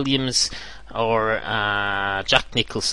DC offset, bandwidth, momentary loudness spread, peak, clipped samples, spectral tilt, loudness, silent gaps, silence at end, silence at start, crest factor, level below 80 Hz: 0.9%; 11.5 kHz; 6 LU; 0 dBFS; under 0.1%; -3 dB/octave; -21 LUFS; none; 0 s; 0 s; 22 dB; -44 dBFS